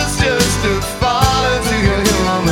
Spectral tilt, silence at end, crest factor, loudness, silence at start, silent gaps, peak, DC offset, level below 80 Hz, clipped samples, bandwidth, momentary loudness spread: -4 dB/octave; 0 s; 14 dB; -14 LUFS; 0 s; none; 0 dBFS; under 0.1%; -24 dBFS; under 0.1%; 17.5 kHz; 3 LU